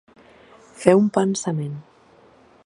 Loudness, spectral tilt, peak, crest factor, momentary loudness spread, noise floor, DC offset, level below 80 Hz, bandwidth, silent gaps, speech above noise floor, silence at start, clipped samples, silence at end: -20 LUFS; -6 dB/octave; 0 dBFS; 22 dB; 15 LU; -53 dBFS; under 0.1%; -64 dBFS; 11.5 kHz; none; 34 dB; 0.8 s; under 0.1%; 0.85 s